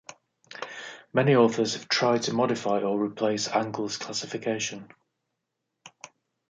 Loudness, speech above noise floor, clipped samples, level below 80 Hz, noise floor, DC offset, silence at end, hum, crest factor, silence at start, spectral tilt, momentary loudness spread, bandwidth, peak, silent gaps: -26 LUFS; 57 dB; under 0.1%; -74 dBFS; -82 dBFS; under 0.1%; 0.6 s; none; 20 dB; 0.1 s; -4.5 dB/octave; 19 LU; 9.4 kHz; -8 dBFS; none